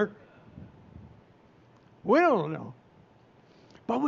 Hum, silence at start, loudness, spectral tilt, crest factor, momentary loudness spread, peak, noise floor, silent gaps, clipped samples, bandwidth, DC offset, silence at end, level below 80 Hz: none; 0 s; -27 LUFS; -5.5 dB/octave; 20 dB; 28 LU; -12 dBFS; -59 dBFS; none; under 0.1%; 7.4 kHz; under 0.1%; 0 s; -68 dBFS